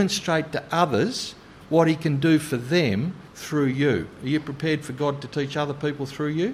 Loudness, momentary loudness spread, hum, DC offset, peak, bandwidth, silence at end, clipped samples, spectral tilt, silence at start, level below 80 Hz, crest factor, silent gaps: -24 LUFS; 8 LU; none; under 0.1%; -6 dBFS; 15.5 kHz; 0 s; under 0.1%; -5.5 dB/octave; 0 s; -56 dBFS; 18 dB; none